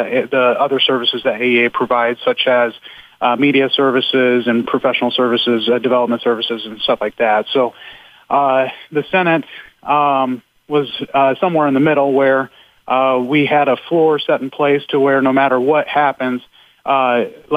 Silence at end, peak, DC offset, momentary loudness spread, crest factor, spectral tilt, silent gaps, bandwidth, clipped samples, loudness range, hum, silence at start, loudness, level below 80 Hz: 0 s; -2 dBFS; under 0.1%; 7 LU; 14 dB; -7 dB/octave; none; 8.2 kHz; under 0.1%; 3 LU; none; 0 s; -15 LUFS; -60 dBFS